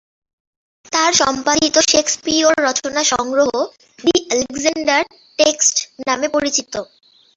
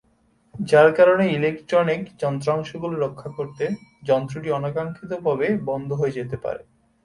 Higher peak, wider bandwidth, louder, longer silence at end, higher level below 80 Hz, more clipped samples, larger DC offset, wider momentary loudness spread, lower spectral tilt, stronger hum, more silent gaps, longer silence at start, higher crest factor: about the same, 0 dBFS vs -2 dBFS; second, 8.4 kHz vs 11.5 kHz; first, -16 LUFS vs -22 LUFS; about the same, 0.5 s vs 0.45 s; about the same, -54 dBFS vs -58 dBFS; neither; neither; second, 8 LU vs 14 LU; second, -1 dB/octave vs -7 dB/octave; neither; neither; first, 0.9 s vs 0.55 s; about the same, 18 dB vs 20 dB